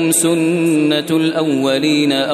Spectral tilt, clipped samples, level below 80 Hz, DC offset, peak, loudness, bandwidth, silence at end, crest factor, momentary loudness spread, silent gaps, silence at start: -4 dB/octave; under 0.1%; -64 dBFS; under 0.1%; -4 dBFS; -15 LUFS; 14 kHz; 0 s; 12 dB; 3 LU; none; 0 s